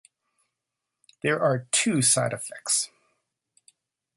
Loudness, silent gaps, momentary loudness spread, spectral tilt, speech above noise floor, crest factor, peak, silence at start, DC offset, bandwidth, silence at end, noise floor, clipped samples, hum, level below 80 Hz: -24 LUFS; none; 10 LU; -3 dB/octave; 60 dB; 20 dB; -8 dBFS; 1.25 s; under 0.1%; 12 kHz; 1.3 s; -85 dBFS; under 0.1%; none; -68 dBFS